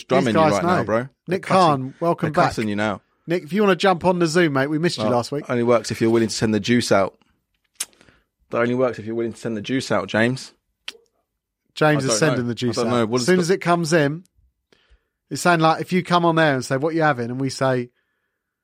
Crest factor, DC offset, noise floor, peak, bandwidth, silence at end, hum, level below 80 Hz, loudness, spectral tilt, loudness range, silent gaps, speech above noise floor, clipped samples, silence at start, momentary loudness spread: 18 dB; under 0.1%; -75 dBFS; -2 dBFS; 16 kHz; 0.8 s; none; -58 dBFS; -20 LUFS; -5.5 dB/octave; 5 LU; none; 56 dB; under 0.1%; 0.1 s; 11 LU